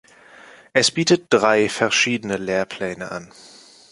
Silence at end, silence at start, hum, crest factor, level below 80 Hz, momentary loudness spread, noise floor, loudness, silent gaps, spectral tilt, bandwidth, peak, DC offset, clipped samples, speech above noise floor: 0.65 s; 0.75 s; none; 20 dB; -60 dBFS; 12 LU; -46 dBFS; -19 LUFS; none; -3 dB/octave; 11.5 kHz; -2 dBFS; under 0.1%; under 0.1%; 26 dB